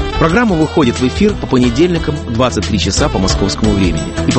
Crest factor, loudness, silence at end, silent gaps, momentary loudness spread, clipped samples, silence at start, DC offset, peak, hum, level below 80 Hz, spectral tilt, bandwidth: 12 dB; -13 LUFS; 0 s; none; 3 LU; under 0.1%; 0 s; under 0.1%; 0 dBFS; none; -24 dBFS; -5.5 dB/octave; 8.8 kHz